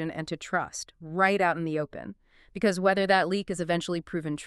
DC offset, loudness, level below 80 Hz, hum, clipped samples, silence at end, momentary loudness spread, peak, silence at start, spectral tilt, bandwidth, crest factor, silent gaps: under 0.1%; -27 LUFS; -60 dBFS; none; under 0.1%; 0 s; 14 LU; -10 dBFS; 0 s; -5 dB/octave; 12.5 kHz; 18 dB; none